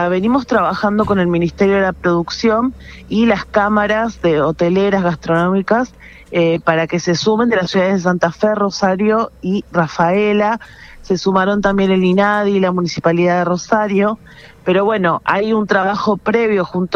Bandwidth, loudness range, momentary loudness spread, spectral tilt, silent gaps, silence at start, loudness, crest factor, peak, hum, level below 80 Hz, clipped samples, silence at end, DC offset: 7.2 kHz; 1 LU; 4 LU; -6.5 dB/octave; none; 0 s; -15 LUFS; 14 dB; 0 dBFS; none; -42 dBFS; under 0.1%; 0 s; under 0.1%